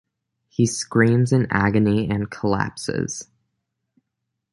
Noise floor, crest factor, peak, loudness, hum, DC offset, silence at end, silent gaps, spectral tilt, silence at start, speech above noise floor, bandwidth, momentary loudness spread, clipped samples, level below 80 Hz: -79 dBFS; 20 dB; -2 dBFS; -21 LUFS; none; under 0.1%; 1.3 s; none; -6 dB/octave; 0.6 s; 60 dB; 11.5 kHz; 9 LU; under 0.1%; -48 dBFS